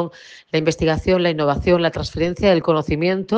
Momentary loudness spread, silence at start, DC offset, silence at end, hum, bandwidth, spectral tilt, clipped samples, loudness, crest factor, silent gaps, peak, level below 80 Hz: 6 LU; 0 s; under 0.1%; 0 s; none; 9 kHz; -6.5 dB/octave; under 0.1%; -19 LUFS; 16 dB; none; -2 dBFS; -38 dBFS